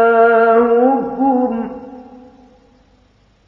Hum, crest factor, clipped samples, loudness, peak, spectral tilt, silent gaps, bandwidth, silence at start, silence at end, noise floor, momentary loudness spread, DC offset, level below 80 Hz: none; 14 dB; under 0.1%; -13 LUFS; -2 dBFS; -8.5 dB/octave; none; 4.4 kHz; 0 s; 1.3 s; -53 dBFS; 18 LU; under 0.1%; -54 dBFS